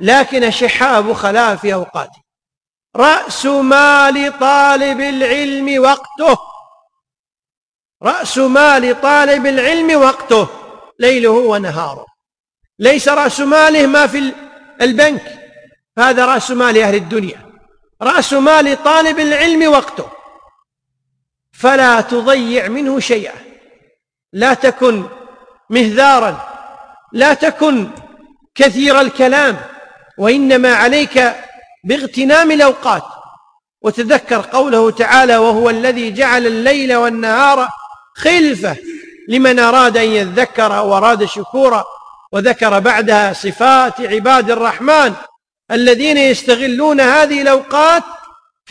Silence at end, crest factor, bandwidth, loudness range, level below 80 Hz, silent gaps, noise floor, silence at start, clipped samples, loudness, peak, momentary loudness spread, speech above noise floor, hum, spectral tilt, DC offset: 0.55 s; 12 dB; 10.5 kHz; 3 LU; -50 dBFS; 7.19-7.24 s, 7.57-7.79 s, 7.85-7.89 s, 7.95-8.00 s, 12.40-12.44 s; under -90 dBFS; 0 s; under 0.1%; -11 LUFS; 0 dBFS; 11 LU; over 79 dB; none; -3.5 dB/octave; under 0.1%